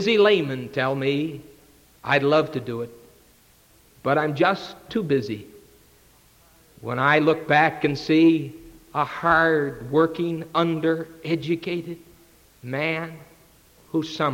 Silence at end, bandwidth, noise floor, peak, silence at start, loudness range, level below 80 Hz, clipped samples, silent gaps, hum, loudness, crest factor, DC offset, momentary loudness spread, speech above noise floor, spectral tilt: 0 s; 16.5 kHz; -56 dBFS; -4 dBFS; 0 s; 6 LU; -58 dBFS; under 0.1%; none; none; -22 LUFS; 18 dB; under 0.1%; 15 LU; 34 dB; -6.5 dB/octave